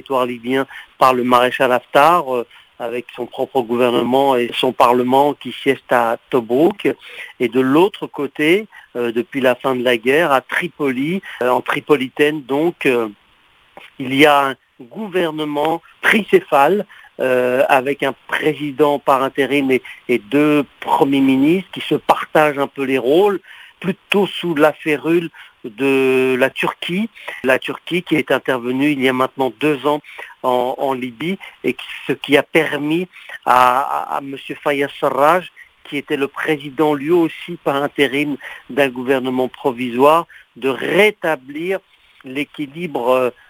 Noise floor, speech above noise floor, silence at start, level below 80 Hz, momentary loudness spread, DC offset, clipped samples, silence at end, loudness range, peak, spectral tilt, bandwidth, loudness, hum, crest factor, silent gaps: -53 dBFS; 37 dB; 0.1 s; -62 dBFS; 11 LU; under 0.1%; under 0.1%; 0.2 s; 3 LU; 0 dBFS; -5.5 dB/octave; 16 kHz; -17 LUFS; none; 18 dB; none